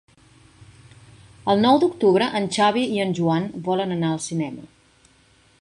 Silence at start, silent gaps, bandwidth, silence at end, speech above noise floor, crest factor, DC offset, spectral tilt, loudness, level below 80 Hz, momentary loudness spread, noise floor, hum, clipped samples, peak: 0.6 s; none; 11.5 kHz; 0.95 s; 37 dB; 18 dB; under 0.1%; -5.5 dB/octave; -21 LUFS; -60 dBFS; 10 LU; -57 dBFS; none; under 0.1%; -4 dBFS